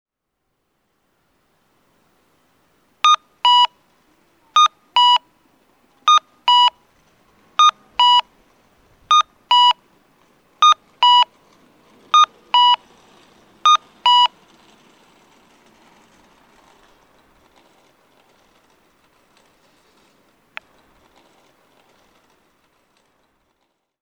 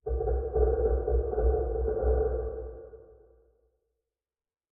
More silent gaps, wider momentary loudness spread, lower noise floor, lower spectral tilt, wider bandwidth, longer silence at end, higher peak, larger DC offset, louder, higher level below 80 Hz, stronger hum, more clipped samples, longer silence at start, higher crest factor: neither; second, 7 LU vs 14 LU; second, -75 dBFS vs under -90 dBFS; second, 2.5 dB/octave vs -8 dB/octave; first, 9.4 kHz vs 1.7 kHz; first, 9.75 s vs 1.7 s; first, 0 dBFS vs -14 dBFS; neither; first, -15 LUFS vs -29 LUFS; second, -70 dBFS vs -32 dBFS; neither; neither; first, 3.05 s vs 0.05 s; about the same, 20 dB vs 16 dB